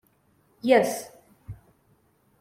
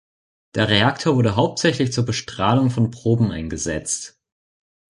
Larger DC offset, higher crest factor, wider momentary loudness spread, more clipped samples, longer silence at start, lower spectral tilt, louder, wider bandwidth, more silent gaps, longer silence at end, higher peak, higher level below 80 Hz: neither; about the same, 22 dB vs 18 dB; first, 25 LU vs 9 LU; neither; about the same, 0.65 s vs 0.55 s; about the same, -4.5 dB/octave vs -5 dB/octave; second, -24 LUFS vs -20 LUFS; first, 16.5 kHz vs 11.5 kHz; neither; about the same, 0.85 s vs 0.85 s; second, -6 dBFS vs -2 dBFS; second, -60 dBFS vs -44 dBFS